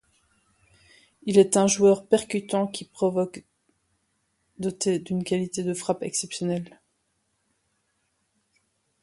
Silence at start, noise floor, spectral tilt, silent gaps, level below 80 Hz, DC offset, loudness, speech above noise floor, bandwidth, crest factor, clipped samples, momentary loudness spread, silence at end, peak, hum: 1.25 s; -73 dBFS; -5 dB/octave; none; -66 dBFS; under 0.1%; -24 LUFS; 50 dB; 11.5 kHz; 22 dB; under 0.1%; 13 LU; 2.35 s; -6 dBFS; none